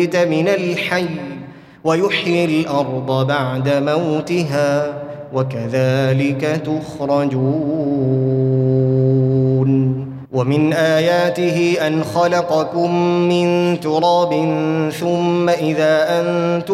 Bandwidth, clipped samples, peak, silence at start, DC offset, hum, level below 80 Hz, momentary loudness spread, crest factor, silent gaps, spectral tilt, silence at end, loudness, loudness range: 14 kHz; under 0.1%; -2 dBFS; 0 s; under 0.1%; none; -56 dBFS; 6 LU; 14 dB; none; -7 dB/octave; 0 s; -17 LUFS; 3 LU